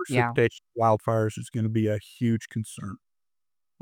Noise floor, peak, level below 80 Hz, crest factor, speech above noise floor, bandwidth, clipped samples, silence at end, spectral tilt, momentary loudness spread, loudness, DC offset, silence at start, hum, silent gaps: under -90 dBFS; -10 dBFS; -66 dBFS; 18 dB; over 64 dB; 15 kHz; under 0.1%; 0.85 s; -7 dB/octave; 13 LU; -27 LUFS; under 0.1%; 0 s; none; none